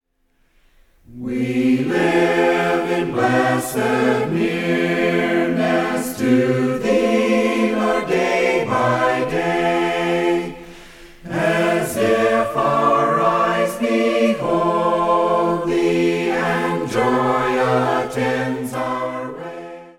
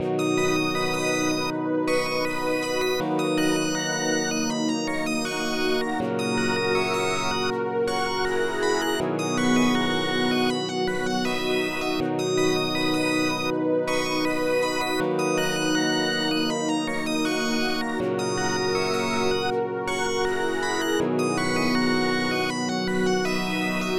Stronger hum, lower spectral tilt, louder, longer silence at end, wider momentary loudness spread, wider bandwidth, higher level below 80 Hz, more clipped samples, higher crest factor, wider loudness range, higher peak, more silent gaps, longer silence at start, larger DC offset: neither; first, -5.5 dB/octave vs -4 dB/octave; first, -18 LUFS vs -24 LUFS; about the same, 0.1 s vs 0 s; first, 6 LU vs 3 LU; second, 16.5 kHz vs 19 kHz; about the same, -50 dBFS vs -50 dBFS; neither; about the same, 14 dB vs 16 dB; about the same, 2 LU vs 1 LU; first, -4 dBFS vs -8 dBFS; neither; first, 1.1 s vs 0 s; neither